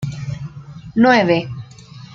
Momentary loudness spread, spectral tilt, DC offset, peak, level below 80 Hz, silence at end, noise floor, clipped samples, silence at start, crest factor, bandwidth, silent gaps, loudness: 22 LU; -6.5 dB/octave; under 0.1%; -2 dBFS; -48 dBFS; 0 s; -39 dBFS; under 0.1%; 0 s; 18 dB; 7.6 kHz; none; -16 LUFS